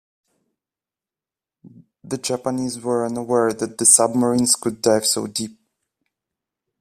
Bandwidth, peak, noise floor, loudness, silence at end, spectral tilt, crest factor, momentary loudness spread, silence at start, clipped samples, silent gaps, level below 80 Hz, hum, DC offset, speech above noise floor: 15.5 kHz; 0 dBFS; under -90 dBFS; -18 LUFS; 1.3 s; -3 dB/octave; 22 dB; 14 LU; 1.65 s; under 0.1%; none; -62 dBFS; none; under 0.1%; over 70 dB